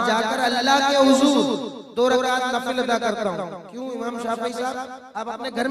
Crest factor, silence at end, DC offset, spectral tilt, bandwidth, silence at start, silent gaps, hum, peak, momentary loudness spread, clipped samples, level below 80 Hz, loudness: 18 dB; 0 s; under 0.1%; -3 dB/octave; 15 kHz; 0 s; none; none; -4 dBFS; 16 LU; under 0.1%; -62 dBFS; -21 LUFS